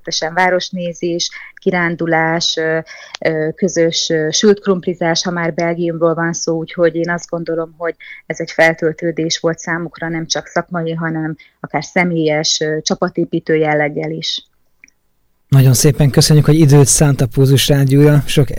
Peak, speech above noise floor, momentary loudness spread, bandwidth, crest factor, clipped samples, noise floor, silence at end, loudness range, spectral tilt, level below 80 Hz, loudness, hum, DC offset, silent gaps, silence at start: 0 dBFS; 45 dB; 11 LU; 16.5 kHz; 14 dB; under 0.1%; -59 dBFS; 0 s; 7 LU; -5 dB/octave; -38 dBFS; -14 LUFS; none; under 0.1%; none; 0.05 s